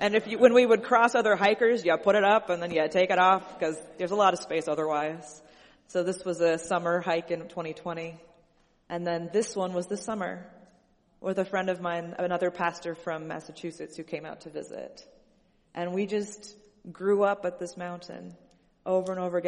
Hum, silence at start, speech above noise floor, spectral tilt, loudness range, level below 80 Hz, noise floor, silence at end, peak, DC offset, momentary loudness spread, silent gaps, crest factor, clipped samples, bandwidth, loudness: none; 0 s; 38 dB; -5 dB/octave; 12 LU; -68 dBFS; -65 dBFS; 0 s; -4 dBFS; under 0.1%; 18 LU; none; 24 dB; under 0.1%; 11.5 kHz; -27 LUFS